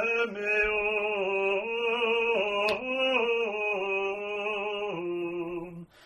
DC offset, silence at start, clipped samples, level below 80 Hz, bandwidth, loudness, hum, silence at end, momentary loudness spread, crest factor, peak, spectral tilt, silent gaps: under 0.1%; 0 s; under 0.1%; -60 dBFS; 12 kHz; -28 LUFS; none; 0.2 s; 8 LU; 16 dB; -14 dBFS; -4.5 dB/octave; none